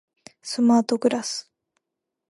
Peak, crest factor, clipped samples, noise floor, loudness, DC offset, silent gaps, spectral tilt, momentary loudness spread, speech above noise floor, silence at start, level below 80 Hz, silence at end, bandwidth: -6 dBFS; 18 dB; under 0.1%; -83 dBFS; -22 LUFS; under 0.1%; none; -4 dB/octave; 14 LU; 62 dB; 0.45 s; -74 dBFS; 0.9 s; 11.5 kHz